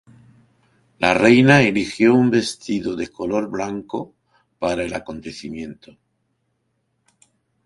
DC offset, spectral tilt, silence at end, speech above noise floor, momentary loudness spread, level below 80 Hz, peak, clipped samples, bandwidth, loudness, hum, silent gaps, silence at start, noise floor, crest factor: under 0.1%; -6 dB/octave; 1.9 s; 52 dB; 19 LU; -52 dBFS; 0 dBFS; under 0.1%; 11.5 kHz; -18 LUFS; none; none; 1 s; -70 dBFS; 20 dB